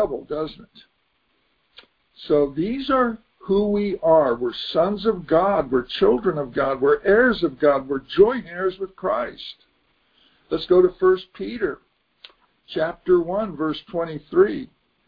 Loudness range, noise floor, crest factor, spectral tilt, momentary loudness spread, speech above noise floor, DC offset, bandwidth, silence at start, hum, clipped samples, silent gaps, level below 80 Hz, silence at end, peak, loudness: 5 LU; -68 dBFS; 18 dB; -8.5 dB/octave; 12 LU; 47 dB; under 0.1%; 5.2 kHz; 0 s; none; under 0.1%; none; -50 dBFS; 0.4 s; -4 dBFS; -21 LUFS